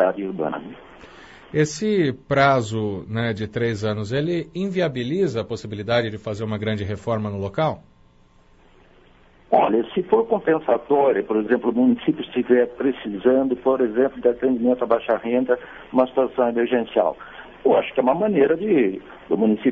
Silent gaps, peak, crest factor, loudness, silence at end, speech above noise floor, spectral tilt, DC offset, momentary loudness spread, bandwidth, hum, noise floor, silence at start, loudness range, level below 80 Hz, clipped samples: none; -4 dBFS; 18 dB; -21 LUFS; 0 s; 33 dB; -7 dB/octave; under 0.1%; 8 LU; 8 kHz; none; -53 dBFS; 0 s; 5 LU; -54 dBFS; under 0.1%